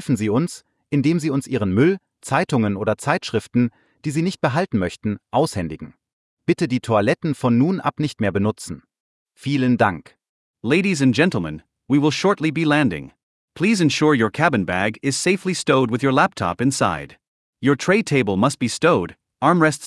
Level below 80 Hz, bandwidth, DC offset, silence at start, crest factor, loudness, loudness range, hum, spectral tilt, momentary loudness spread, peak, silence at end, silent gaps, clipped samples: -56 dBFS; 12 kHz; under 0.1%; 0 s; 16 dB; -20 LUFS; 3 LU; none; -5.5 dB/octave; 11 LU; -4 dBFS; 0 s; 6.13-6.37 s, 9.00-9.26 s, 10.29-10.54 s, 13.23-13.48 s, 17.28-17.53 s; under 0.1%